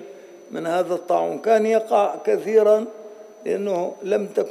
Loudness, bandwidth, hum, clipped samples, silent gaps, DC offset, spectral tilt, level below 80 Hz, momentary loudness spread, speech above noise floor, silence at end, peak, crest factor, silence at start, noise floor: -21 LUFS; 14 kHz; none; under 0.1%; none; under 0.1%; -5.5 dB/octave; -84 dBFS; 17 LU; 21 dB; 0 s; -6 dBFS; 16 dB; 0 s; -42 dBFS